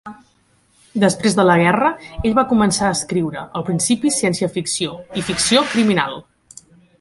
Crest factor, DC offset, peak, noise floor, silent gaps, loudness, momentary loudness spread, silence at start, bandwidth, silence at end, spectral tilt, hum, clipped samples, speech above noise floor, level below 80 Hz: 18 dB; under 0.1%; -2 dBFS; -58 dBFS; none; -17 LUFS; 10 LU; 0.05 s; 11.5 kHz; 0.8 s; -4 dB/octave; none; under 0.1%; 41 dB; -44 dBFS